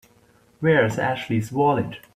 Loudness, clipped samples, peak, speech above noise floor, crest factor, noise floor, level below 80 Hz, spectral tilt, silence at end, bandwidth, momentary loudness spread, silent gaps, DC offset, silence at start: -22 LUFS; under 0.1%; -6 dBFS; 36 dB; 16 dB; -57 dBFS; -56 dBFS; -6.5 dB/octave; 0.2 s; 15 kHz; 6 LU; none; under 0.1%; 0.6 s